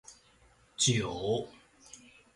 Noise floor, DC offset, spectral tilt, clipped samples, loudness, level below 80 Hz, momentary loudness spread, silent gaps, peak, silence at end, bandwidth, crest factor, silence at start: -64 dBFS; under 0.1%; -3.5 dB/octave; under 0.1%; -30 LUFS; -60 dBFS; 25 LU; none; -14 dBFS; 0.4 s; 11.5 kHz; 20 dB; 0.1 s